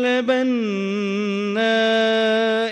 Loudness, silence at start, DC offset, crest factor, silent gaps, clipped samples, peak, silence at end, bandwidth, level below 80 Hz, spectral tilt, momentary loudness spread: -19 LUFS; 0 s; under 0.1%; 14 dB; none; under 0.1%; -6 dBFS; 0 s; 9.4 kHz; -68 dBFS; -5 dB/octave; 5 LU